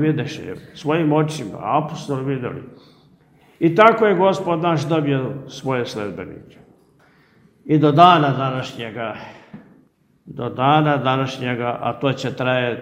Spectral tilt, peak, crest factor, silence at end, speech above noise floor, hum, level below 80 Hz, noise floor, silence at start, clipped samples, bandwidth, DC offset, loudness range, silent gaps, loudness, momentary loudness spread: -6.5 dB/octave; 0 dBFS; 20 dB; 0 s; 38 dB; none; -60 dBFS; -56 dBFS; 0 s; under 0.1%; 11 kHz; under 0.1%; 5 LU; none; -19 LUFS; 17 LU